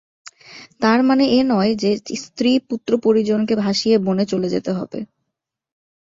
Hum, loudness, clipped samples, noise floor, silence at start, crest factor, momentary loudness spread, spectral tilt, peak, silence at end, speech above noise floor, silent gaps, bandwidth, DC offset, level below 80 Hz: none; -18 LUFS; under 0.1%; -81 dBFS; 0.5 s; 18 dB; 12 LU; -5.5 dB/octave; -2 dBFS; 1 s; 63 dB; none; 7.8 kHz; under 0.1%; -58 dBFS